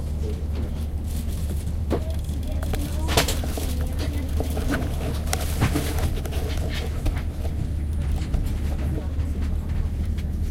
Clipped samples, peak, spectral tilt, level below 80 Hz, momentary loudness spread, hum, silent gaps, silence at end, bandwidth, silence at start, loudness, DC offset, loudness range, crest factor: under 0.1%; -2 dBFS; -5.5 dB/octave; -26 dBFS; 5 LU; none; none; 0 s; 16.5 kHz; 0 s; -27 LUFS; under 0.1%; 2 LU; 22 dB